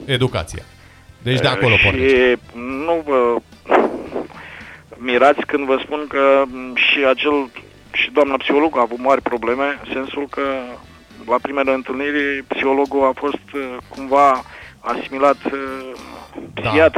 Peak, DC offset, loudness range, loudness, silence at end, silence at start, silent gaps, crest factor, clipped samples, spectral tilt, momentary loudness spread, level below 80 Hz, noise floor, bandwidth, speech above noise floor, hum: 0 dBFS; under 0.1%; 4 LU; -17 LUFS; 0 s; 0 s; none; 18 dB; under 0.1%; -6 dB/octave; 17 LU; -44 dBFS; -38 dBFS; 12.5 kHz; 20 dB; none